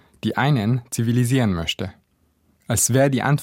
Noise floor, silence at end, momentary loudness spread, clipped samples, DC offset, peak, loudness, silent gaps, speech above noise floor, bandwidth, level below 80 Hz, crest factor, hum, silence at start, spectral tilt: -64 dBFS; 0 s; 9 LU; under 0.1%; under 0.1%; -4 dBFS; -20 LUFS; none; 44 dB; 16.5 kHz; -48 dBFS; 16 dB; none; 0.25 s; -5 dB/octave